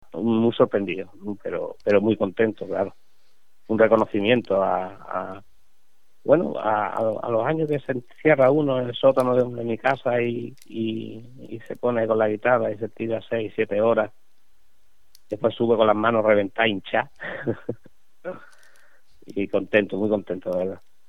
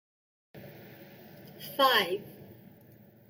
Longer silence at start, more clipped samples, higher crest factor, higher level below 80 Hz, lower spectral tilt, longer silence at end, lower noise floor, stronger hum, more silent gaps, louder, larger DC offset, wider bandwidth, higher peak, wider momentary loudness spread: second, 0.15 s vs 0.55 s; neither; about the same, 20 dB vs 22 dB; first, -62 dBFS vs -80 dBFS; first, -7.5 dB/octave vs -3 dB/octave; second, 0.35 s vs 0.75 s; first, -69 dBFS vs -56 dBFS; neither; neither; first, -23 LUFS vs -27 LUFS; first, 0.6% vs under 0.1%; second, 11.5 kHz vs 17 kHz; first, -2 dBFS vs -12 dBFS; second, 15 LU vs 26 LU